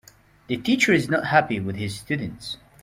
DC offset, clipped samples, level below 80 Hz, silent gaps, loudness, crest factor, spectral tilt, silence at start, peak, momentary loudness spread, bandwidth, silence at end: under 0.1%; under 0.1%; -56 dBFS; none; -23 LUFS; 20 dB; -5 dB/octave; 0.5 s; -4 dBFS; 13 LU; 16 kHz; 0.3 s